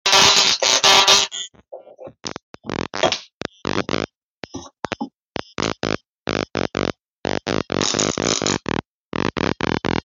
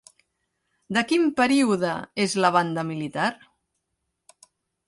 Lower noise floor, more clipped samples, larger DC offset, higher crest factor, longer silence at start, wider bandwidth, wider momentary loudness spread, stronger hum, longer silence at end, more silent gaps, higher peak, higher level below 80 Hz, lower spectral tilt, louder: second, -41 dBFS vs -79 dBFS; neither; neither; about the same, 18 dB vs 20 dB; second, 0.05 s vs 0.9 s; first, 16.5 kHz vs 11.5 kHz; first, 21 LU vs 7 LU; neither; second, 0.05 s vs 1.55 s; first, 2.43-2.54 s, 3.33-3.41 s, 4.16-4.42 s, 5.15-5.34 s, 6.08-6.26 s, 7.05-7.24 s, 8.85-9.12 s vs none; first, -2 dBFS vs -6 dBFS; first, -48 dBFS vs -68 dBFS; second, -2 dB/octave vs -4.5 dB/octave; first, -18 LUFS vs -23 LUFS